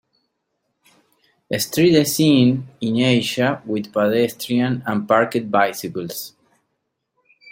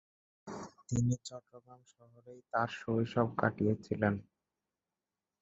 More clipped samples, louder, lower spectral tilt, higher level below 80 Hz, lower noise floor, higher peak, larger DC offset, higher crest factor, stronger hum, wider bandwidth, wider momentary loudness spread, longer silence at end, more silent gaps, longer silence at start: neither; first, -19 LUFS vs -34 LUFS; second, -5 dB/octave vs -6.5 dB/octave; about the same, -60 dBFS vs -62 dBFS; second, -75 dBFS vs under -90 dBFS; first, -2 dBFS vs -12 dBFS; neither; second, 18 dB vs 24 dB; neither; first, 16.5 kHz vs 8 kHz; second, 12 LU vs 16 LU; about the same, 1.25 s vs 1.2 s; neither; first, 1.5 s vs 0.45 s